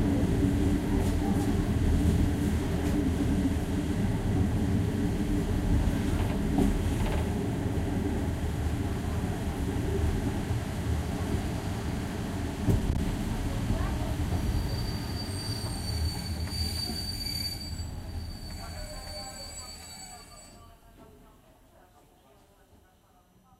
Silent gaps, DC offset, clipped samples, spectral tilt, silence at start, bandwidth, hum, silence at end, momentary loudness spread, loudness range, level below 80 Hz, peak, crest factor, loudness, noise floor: none; under 0.1%; under 0.1%; -6 dB/octave; 0 s; 16 kHz; none; 2.45 s; 12 LU; 13 LU; -36 dBFS; -12 dBFS; 16 dB; -30 LUFS; -61 dBFS